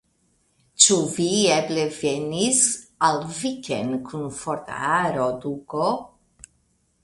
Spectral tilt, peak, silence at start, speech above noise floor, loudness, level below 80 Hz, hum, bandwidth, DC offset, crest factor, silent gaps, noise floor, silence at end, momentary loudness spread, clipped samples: -2.5 dB/octave; 0 dBFS; 0.8 s; 44 dB; -22 LUFS; -60 dBFS; none; 11.5 kHz; under 0.1%; 24 dB; none; -66 dBFS; 1 s; 14 LU; under 0.1%